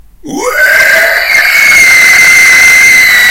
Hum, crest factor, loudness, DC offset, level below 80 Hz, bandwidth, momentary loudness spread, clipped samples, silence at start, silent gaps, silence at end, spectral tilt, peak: none; 4 dB; -2 LUFS; under 0.1%; -38 dBFS; over 20 kHz; 8 LU; 9%; 0.25 s; none; 0 s; 0.5 dB/octave; 0 dBFS